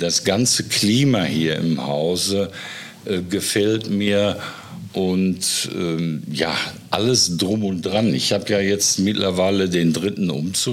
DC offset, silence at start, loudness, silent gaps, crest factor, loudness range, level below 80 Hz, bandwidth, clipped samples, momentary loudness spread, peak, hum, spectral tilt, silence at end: under 0.1%; 0 s; -19 LUFS; none; 18 dB; 3 LU; -56 dBFS; 16.5 kHz; under 0.1%; 8 LU; -2 dBFS; none; -4 dB/octave; 0 s